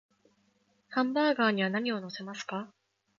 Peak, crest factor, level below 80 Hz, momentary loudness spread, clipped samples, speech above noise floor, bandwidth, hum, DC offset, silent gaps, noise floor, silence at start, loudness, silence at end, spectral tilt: -14 dBFS; 18 dB; -80 dBFS; 14 LU; under 0.1%; 41 dB; 7.6 kHz; none; under 0.1%; none; -71 dBFS; 0.9 s; -31 LUFS; 0.5 s; -5.5 dB/octave